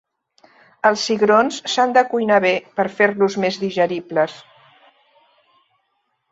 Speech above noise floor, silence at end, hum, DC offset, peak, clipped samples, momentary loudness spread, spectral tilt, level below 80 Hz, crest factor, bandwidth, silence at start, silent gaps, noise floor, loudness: 53 dB; 1.9 s; none; under 0.1%; -2 dBFS; under 0.1%; 6 LU; -4 dB/octave; -66 dBFS; 18 dB; 8 kHz; 0.85 s; none; -70 dBFS; -18 LUFS